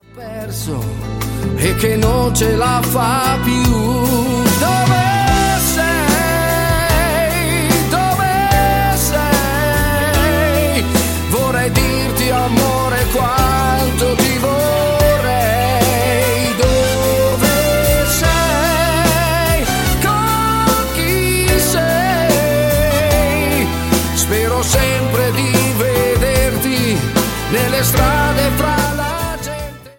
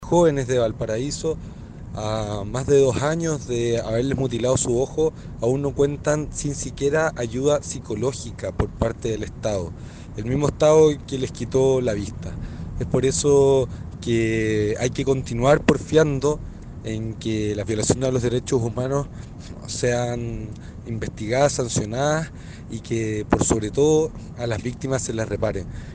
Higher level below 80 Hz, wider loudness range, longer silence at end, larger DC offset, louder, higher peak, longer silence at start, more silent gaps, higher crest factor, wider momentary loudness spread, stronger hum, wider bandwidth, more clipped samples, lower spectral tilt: first, -24 dBFS vs -40 dBFS; second, 1 LU vs 4 LU; about the same, 0.1 s vs 0 s; neither; first, -14 LUFS vs -22 LUFS; about the same, 0 dBFS vs -2 dBFS; first, 0.15 s vs 0 s; neither; second, 14 dB vs 20 dB; second, 3 LU vs 14 LU; neither; first, 17 kHz vs 10 kHz; neither; about the same, -4.5 dB/octave vs -5.5 dB/octave